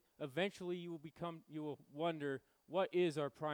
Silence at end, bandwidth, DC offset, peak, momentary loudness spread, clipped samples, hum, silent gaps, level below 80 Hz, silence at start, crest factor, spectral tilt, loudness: 0 s; 19.5 kHz; under 0.1%; -24 dBFS; 11 LU; under 0.1%; none; none; -84 dBFS; 0.2 s; 18 dB; -6 dB/octave; -42 LUFS